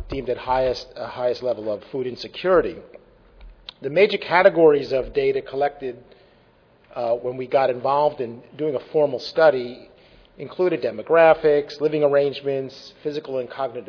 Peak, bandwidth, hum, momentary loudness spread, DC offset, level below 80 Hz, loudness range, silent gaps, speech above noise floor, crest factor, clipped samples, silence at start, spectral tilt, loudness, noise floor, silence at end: -2 dBFS; 5.4 kHz; none; 17 LU; under 0.1%; -50 dBFS; 5 LU; none; 35 dB; 20 dB; under 0.1%; 0 s; -6.5 dB/octave; -21 LUFS; -56 dBFS; 0.05 s